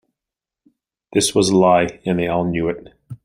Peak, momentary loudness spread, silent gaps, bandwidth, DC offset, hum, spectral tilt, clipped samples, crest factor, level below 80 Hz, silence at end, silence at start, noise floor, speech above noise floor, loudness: -2 dBFS; 9 LU; none; 15.5 kHz; under 0.1%; none; -4.5 dB/octave; under 0.1%; 18 dB; -50 dBFS; 0.1 s; 1.15 s; -87 dBFS; 70 dB; -18 LUFS